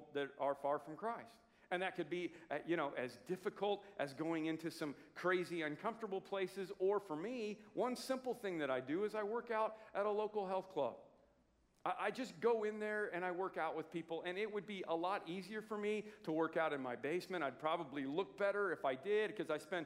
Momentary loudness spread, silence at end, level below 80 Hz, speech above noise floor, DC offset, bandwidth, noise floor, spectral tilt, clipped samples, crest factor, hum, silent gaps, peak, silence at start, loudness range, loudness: 7 LU; 0 s; -84 dBFS; 34 dB; under 0.1%; 16 kHz; -75 dBFS; -5.5 dB/octave; under 0.1%; 18 dB; none; none; -24 dBFS; 0 s; 2 LU; -42 LUFS